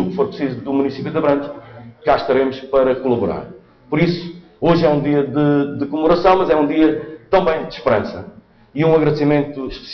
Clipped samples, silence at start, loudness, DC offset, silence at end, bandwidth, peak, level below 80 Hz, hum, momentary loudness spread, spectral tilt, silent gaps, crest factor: under 0.1%; 0 s; -17 LUFS; under 0.1%; 0 s; 6.2 kHz; -2 dBFS; -44 dBFS; none; 12 LU; -6 dB/octave; none; 14 dB